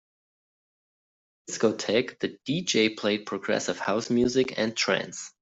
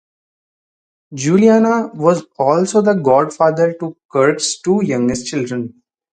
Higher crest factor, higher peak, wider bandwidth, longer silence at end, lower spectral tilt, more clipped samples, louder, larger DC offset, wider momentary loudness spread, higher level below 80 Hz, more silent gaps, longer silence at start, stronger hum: about the same, 18 dB vs 16 dB; second, -10 dBFS vs 0 dBFS; second, 8.2 kHz vs 9.4 kHz; second, 0.15 s vs 0.45 s; second, -3.5 dB/octave vs -5.5 dB/octave; neither; second, -26 LUFS vs -15 LUFS; neither; second, 7 LU vs 11 LU; second, -66 dBFS vs -56 dBFS; second, none vs 4.05-4.09 s; first, 1.5 s vs 1.1 s; neither